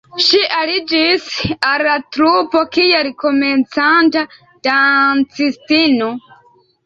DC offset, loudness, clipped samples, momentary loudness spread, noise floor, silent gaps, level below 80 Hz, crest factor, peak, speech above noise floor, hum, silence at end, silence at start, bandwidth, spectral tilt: under 0.1%; -13 LUFS; under 0.1%; 8 LU; -51 dBFS; none; -52 dBFS; 14 dB; 0 dBFS; 37 dB; none; 0.65 s; 0.15 s; 7.6 kHz; -4 dB/octave